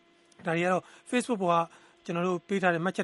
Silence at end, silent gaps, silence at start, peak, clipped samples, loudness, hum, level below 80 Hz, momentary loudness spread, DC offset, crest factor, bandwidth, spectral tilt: 0 s; none; 0.4 s; -10 dBFS; under 0.1%; -29 LUFS; none; -76 dBFS; 10 LU; under 0.1%; 20 dB; 11.5 kHz; -5.5 dB/octave